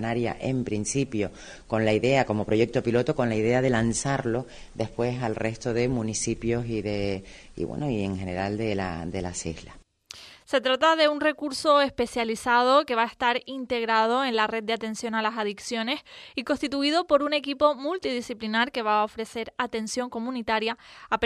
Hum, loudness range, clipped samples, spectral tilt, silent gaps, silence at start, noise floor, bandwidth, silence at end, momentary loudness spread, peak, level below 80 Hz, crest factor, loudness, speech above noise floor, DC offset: none; 6 LU; under 0.1%; -4.5 dB/octave; none; 0 s; -48 dBFS; 13.5 kHz; 0 s; 11 LU; -8 dBFS; -52 dBFS; 18 dB; -26 LUFS; 22 dB; under 0.1%